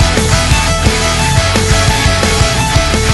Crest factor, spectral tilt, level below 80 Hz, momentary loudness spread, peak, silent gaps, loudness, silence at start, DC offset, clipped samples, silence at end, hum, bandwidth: 10 dB; -3.5 dB/octave; -16 dBFS; 1 LU; 0 dBFS; none; -11 LUFS; 0 s; under 0.1%; under 0.1%; 0 s; none; 12 kHz